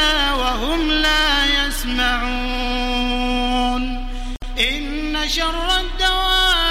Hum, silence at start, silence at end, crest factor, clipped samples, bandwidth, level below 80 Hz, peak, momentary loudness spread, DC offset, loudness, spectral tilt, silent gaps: none; 0 s; 0 s; 14 dB; under 0.1%; 16 kHz; -26 dBFS; -4 dBFS; 9 LU; under 0.1%; -18 LUFS; -2.5 dB/octave; none